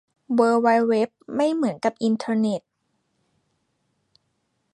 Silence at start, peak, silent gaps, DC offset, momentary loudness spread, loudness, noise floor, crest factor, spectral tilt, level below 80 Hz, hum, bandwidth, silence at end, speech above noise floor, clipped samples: 0.3 s; -6 dBFS; none; under 0.1%; 7 LU; -22 LUFS; -73 dBFS; 18 dB; -6 dB/octave; -74 dBFS; none; 10.5 kHz; 2.15 s; 52 dB; under 0.1%